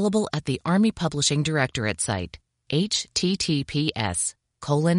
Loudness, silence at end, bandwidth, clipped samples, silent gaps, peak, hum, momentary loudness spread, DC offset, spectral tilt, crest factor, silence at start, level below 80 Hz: -24 LUFS; 0 s; 11 kHz; under 0.1%; none; -4 dBFS; none; 6 LU; under 0.1%; -4.5 dB/octave; 20 dB; 0 s; -52 dBFS